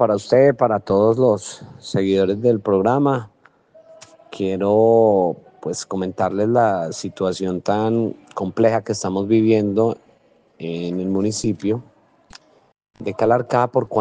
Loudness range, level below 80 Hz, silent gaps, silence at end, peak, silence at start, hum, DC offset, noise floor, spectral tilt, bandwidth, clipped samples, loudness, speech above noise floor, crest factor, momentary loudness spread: 4 LU; -60 dBFS; none; 0 s; -2 dBFS; 0 s; none; under 0.1%; -56 dBFS; -6.5 dB/octave; 9.8 kHz; under 0.1%; -19 LUFS; 37 dB; 18 dB; 12 LU